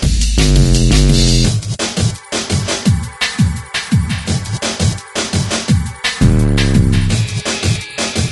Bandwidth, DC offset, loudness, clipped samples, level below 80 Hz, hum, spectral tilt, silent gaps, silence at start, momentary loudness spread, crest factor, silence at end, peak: 12 kHz; under 0.1%; -15 LUFS; under 0.1%; -20 dBFS; none; -4.5 dB/octave; none; 0 s; 7 LU; 14 dB; 0 s; 0 dBFS